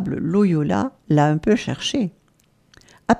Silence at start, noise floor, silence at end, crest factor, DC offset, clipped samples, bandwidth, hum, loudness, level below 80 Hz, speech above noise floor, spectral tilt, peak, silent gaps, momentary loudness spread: 0 s; -60 dBFS; 0 s; 18 dB; under 0.1%; under 0.1%; 10.5 kHz; none; -20 LUFS; -50 dBFS; 40 dB; -6.5 dB/octave; -2 dBFS; none; 7 LU